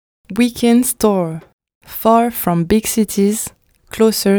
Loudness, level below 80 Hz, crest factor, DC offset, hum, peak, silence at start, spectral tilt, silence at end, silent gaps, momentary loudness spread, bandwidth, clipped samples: -15 LUFS; -44 dBFS; 16 dB; under 0.1%; none; 0 dBFS; 0.3 s; -5 dB/octave; 0 s; 1.53-1.59 s, 1.75-1.81 s; 13 LU; over 20 kHz; under 0.1%